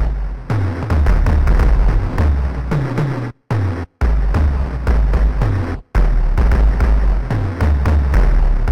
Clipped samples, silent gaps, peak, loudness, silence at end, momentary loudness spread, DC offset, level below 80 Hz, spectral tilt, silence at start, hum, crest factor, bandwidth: under 0.1%; none; -2 dBFS; -18 LUFS; 0 s; 6 LU; 3%; -14 dBFS; -8.5 dB/octave; 0 s; none; 12 dB; 6.2 kHz